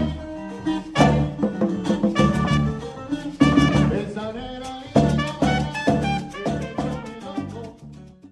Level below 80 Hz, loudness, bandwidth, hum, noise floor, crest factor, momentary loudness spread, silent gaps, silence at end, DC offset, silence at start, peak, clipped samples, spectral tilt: -38 dBFS; -22 LUFS; 11.5 kHz; none; -42 dBFS; 18 dB; 14 LU; none; 0.05 s; under 0.1%; 0 s; -4 dBFS; under 0.1%; -6.5 dB/octave